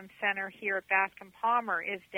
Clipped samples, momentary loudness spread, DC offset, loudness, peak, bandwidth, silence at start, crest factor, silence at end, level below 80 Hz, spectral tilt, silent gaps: under 0.1%; 5 LU; under 0.1%; -31 LUFS; -12 dBFS; 19 kHz; 0 s; 20 dB; 0 s; -78 dBFS; -4.5 dB/octave; none